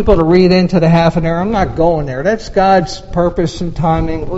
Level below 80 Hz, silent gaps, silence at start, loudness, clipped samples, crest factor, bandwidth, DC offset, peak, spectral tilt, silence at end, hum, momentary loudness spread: -26 dBFS; none; 0 s; -13 LUFS; 0.1%; 12 dB; 8 kHz; under 0.1%; 0 dBFS; -7.5 dB/octave; 0 s; none; 8 LU